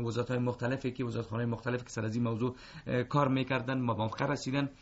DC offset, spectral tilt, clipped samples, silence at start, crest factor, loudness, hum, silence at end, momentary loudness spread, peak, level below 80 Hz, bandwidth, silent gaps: under 0.1%; -6 dB/octave; under 0.1%; 0 s; 18 dB; -33 LUFS; none; 0.05 s; 6 LU; -16 dBFS; -60 dBFS; 8 kHz; none